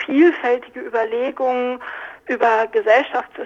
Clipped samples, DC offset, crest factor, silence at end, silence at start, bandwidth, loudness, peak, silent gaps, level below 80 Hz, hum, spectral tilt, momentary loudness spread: under 0.1%; under 0.1%; 16 dB; 0 s; 0 s; 7.2 kHz; -19 LUFS; -2 dBFS; none; -66 dBFS; none; -4.5 dB/octave; 11 LU